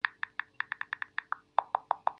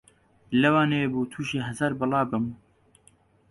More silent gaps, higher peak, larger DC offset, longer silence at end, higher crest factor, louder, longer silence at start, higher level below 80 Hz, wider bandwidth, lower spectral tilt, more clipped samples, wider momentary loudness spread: neither; about the same, -8 dBFS vs -8 dBFS; neither; second, 0.1 s vs 0.95 s; first, 28 dB vs 18 dB; second, -35 LUFS vs -25 LUFS; second, 0.05 s vs 0.5 s; second, -82 dBFS vs -60 dBFS; second, 6.2 kHz vs 11.5 kHz; second, -3 dB/octave vs -6.5 dB/octave; neither; second, 6 LU vs 9 LU